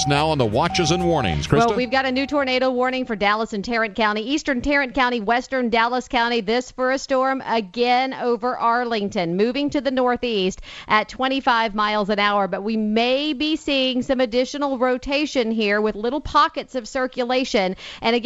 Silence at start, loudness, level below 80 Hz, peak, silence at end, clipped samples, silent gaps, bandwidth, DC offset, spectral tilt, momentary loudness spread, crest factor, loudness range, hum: 0 s; -21 LUFS; -44 dBFS; -4 dBFS; 0 s; under 0.1%; none; 10.5 kHz; under 0.1%; -4.5 dB/octave; 4 LU; 16 dB; 1 LU; none